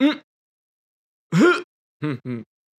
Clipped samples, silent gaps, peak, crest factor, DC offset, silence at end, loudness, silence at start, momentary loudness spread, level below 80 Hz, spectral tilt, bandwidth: under 0.1%; 0.24-1.30 s, 1.64-2.00 s; -4 dBFS; 18 dB; under 0.1%; 0.35 s; -22 LUFS; 0 s; 16 LU; -78 dBFS; -6.5 dB/octave; 13 kHz